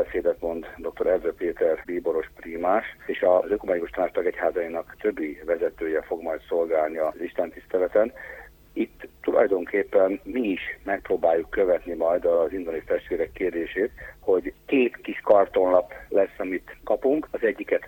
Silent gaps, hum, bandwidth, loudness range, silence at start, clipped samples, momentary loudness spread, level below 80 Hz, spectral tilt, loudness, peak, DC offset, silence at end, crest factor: none; none; 17 kHz; 3 LU; 0 s; under 0.1%; 9 LU; -52 dBFS; -7 dB/octave; -25 LUFS; -6 dBFS; under 0.1%; 0 s; 20 dB